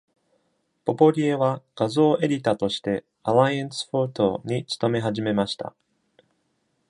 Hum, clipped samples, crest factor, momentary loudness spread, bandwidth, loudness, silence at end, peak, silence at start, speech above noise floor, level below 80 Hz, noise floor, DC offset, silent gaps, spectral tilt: none; under 0.1%; 20 dB; 9 LU; 11 kHz; -23 LUFS; 1.2 s; -4 dBFS; 0.85 s; 49 dB; -62 dBFS; -71 dBFS; under 0.1%; none; -6.5 dB/octave